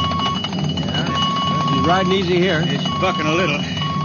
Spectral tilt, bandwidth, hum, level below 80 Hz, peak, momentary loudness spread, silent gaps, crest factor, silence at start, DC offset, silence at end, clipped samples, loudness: -5.5 dB/octave; 7.2 kHz; none; -44 dBFS; -4 dBFS; 5 LU; none; 14 dB; 0 s; under 0.1%; 0 s; under 0.1%; -18 LUFS